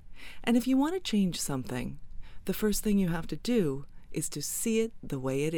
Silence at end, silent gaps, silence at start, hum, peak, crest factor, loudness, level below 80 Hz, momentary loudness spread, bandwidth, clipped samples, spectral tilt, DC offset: 0 s; none; 0 s; none; -14 dBFS; 16 dB; -30 LUFS; -46 dBFS; 12 LU; 19 kHz; under 0.1%; -5 dB/octave; under 0.1%